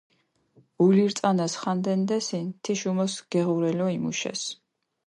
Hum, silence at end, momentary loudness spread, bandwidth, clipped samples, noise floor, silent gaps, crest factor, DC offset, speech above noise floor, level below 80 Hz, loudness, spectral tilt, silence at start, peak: none; 0.5 s; 9 LU; 11 kHz; under 0.1%; -62 dBFS; none; 16 dB; under 0.1%; 38 dB; -72 dBFS; -26 LUFS; -5.5 dB/octave; 0.8 s; -10 dBFS